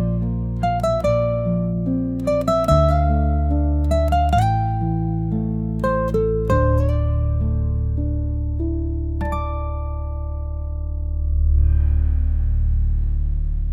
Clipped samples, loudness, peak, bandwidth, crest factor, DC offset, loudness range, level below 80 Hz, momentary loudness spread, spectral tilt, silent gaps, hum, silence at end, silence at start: under 0.1%; -21 LUFS; -4 dBFS; 9.6 kHz; 14 dB; under 0.1%; 6 LU; -22 dBFS; 9 LU; -8.5 dB/octave; none; none; 0 s; 0 s